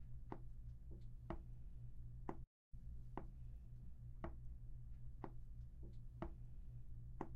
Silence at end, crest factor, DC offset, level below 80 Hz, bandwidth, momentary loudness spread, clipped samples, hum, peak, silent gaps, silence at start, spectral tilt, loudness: 0 s; 22 dB; under 0.1%; -54 dBFS; 4 kHz; 4 LU; under 0.1%; none; -30 dBFS; 2.47-2.71 s; 0 s; -8.5 dB/octave; -57 LUFS